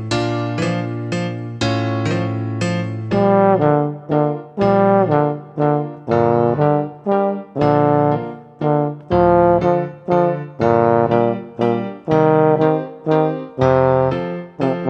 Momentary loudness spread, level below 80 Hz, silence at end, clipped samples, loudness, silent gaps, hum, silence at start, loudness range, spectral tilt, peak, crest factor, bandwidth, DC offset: 9 LU; -46 dBFS; 0 s; under 0.1%; -17 LUFS; none; none; 0 s; 2 LU; -8 dB/octave; 0 dBFS; 16 dB; 9 kHz; under 0.1%